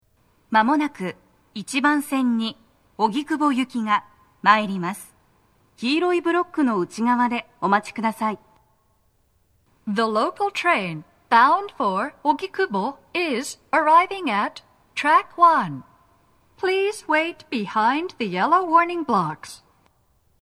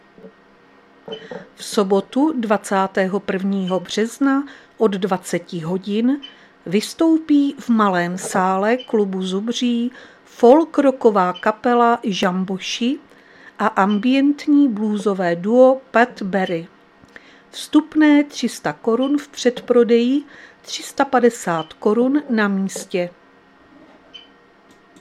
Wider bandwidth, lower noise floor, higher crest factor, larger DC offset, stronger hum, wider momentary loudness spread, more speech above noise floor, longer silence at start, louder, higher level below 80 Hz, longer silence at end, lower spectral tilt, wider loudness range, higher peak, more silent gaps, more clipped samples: about the same, 14 kHz vs 14 kHz; first, -64 dBFS vs -50 dBFS; about the same, 22 dB vs 18 dB; neither; neither; about the same, 12 LU vs 11 LU; first, 43 dB vs 33 dB; first, 0.5 s vs 0.25 s; second, -21 LUFS vs -18 LUFS; about the same, -68 dBFS vs -66 dBFS; about the same, 0.85 s vs 0.8 s; about the same, -4.5 dB/octave vs -5.5 dB/octave; about the same, 4 LU vs 4 LU; about the same, 0 dBFS vs 0 dBFS; neither; neither